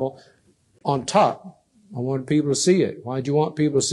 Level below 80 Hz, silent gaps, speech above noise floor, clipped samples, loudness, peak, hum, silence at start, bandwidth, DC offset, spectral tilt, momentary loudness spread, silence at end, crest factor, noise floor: -64 dBFS; none; 26 dB; under 0.1%; -22 LUFS; -6 dBFS; none; 0 s; 12 kHz; under 0.1%; -5 dB/octave; 12 LU; 0 s; 18 dB; -47 dBFS